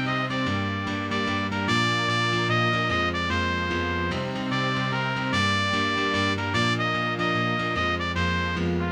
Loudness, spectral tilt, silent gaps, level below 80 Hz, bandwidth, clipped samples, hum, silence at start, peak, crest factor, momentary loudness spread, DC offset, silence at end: -24 LUFS; -5 dB/octave; none; -46 dBFS; 12 kHz; under 0.1%; none; 0 s; -10 dBFS; 14 dB; 4 LU; under 0.1%; 0 s